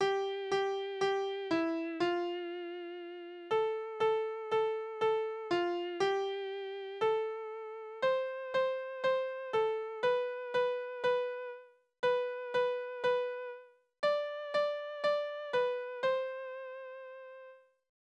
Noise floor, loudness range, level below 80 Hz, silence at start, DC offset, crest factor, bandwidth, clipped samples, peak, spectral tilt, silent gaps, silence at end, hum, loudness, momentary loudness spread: -56 dBFS; 2 LU; -80 dBFS; 0 s; under 0.1%; 16 dB; 9.2 kHz; under 0.1%; -18 dBFS; -4.5 dB/octave; none; 0.45 s; none; -35 LUFS; 12 LU